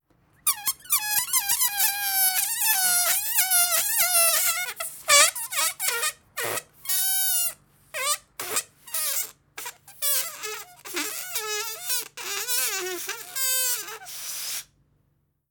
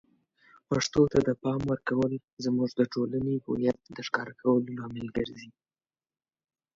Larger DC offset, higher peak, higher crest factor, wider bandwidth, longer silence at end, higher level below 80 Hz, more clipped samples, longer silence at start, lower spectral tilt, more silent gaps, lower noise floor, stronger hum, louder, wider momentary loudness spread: neither; first, -4 dBFS vs -10 dBFS; about the same, 22 dB vs 20 dB; first, over 20 kHz vs 7.6 kHz; second, 0.85 s vs 1.25 s; second, -68 dBFS vs -58 dBFS; neither; second, 0.45 s vs 0.7 s; second, 2 dB/octave vs -6 dB/octave; second, none vs 2.24-2.37 s; second, -70 dBFS vs under -90 dBFS; neither; first, -23 LUFS vs -29 LUFS; about the same, 13 LU vs 11 LU